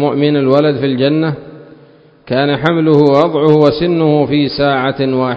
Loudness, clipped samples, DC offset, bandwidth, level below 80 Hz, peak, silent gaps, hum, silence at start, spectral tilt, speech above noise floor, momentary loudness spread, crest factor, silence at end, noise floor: -12 LUFS; 0.2%; under 0.1%; 6.6 kHz; -46 dBFS; 0 dBFS; none; none; 0 s; -8.5 dB/octave; 32 dB; 6 LU; 12 dB; 0 s; -43 dBFS